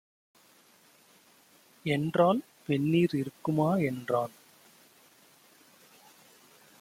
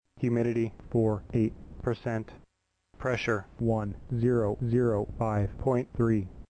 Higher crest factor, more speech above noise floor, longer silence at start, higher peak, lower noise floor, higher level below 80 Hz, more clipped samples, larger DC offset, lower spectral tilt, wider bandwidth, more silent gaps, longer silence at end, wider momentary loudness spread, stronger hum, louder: about the same, 20 dB vs 16 dB; second, 34 dB vs 42 dB; first, 1.85 s vs 0.2 s; about the same, -12 dBFS vs -14 dBFS; second, -61 dBFS vs -70 dBFS; second, -70 dBFS vs -48 dBFS; neither; neither; about the same, -7.5 dB/octave vs -8.5 dB/octave; first, 16.5 kHz vs 9 kHz; neither; first, 2.5 s vs 0.05 s; about the same, 7 LU vs 7 LU; neither; about the same, -29 LUFS vs -30 LUFS